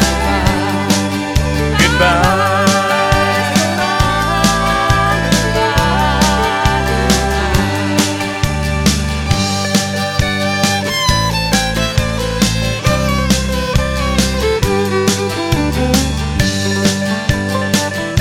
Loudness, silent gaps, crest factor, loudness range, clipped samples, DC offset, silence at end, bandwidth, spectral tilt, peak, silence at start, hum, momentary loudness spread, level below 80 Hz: -14 LUFS; none; 14 dB; 2 LU; under 0.1%; under 0.1%; 0 s; 17.5 kHz; -4.5 dB/octave; 0 dBFS; 0 s; none; 4 LU; -24 dBFS